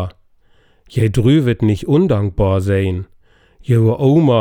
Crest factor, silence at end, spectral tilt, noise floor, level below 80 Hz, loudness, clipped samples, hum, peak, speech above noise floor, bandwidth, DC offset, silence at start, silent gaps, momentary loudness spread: 14 dB; 0 s; -8.5 dB/octave; -52 dBFS; -36 dBFS; -15 LUFS; under 0.1%; none; -2 dBFS; 38 dB; 11.5 kHz; under 0.1%; 0 s; none; 13 LU